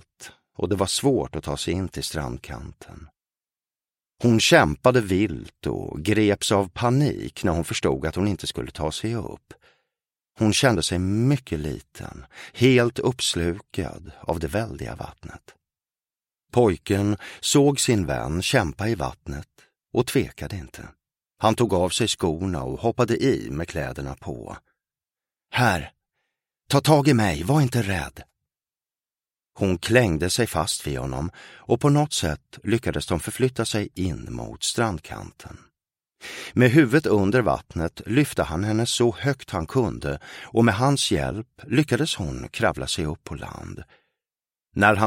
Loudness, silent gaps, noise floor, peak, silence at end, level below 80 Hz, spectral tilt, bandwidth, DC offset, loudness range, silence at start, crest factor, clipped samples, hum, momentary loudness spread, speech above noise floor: -23 LUFS; none; under -90 dBFS; -2 dBFS; 0 s; -44 dBFS; -5 dB/octave; 16.5 kHz; under 0.1%; 6 LU; 0.2 s; 22 dB; under 0.1%; none; 17 LU; over 67 dB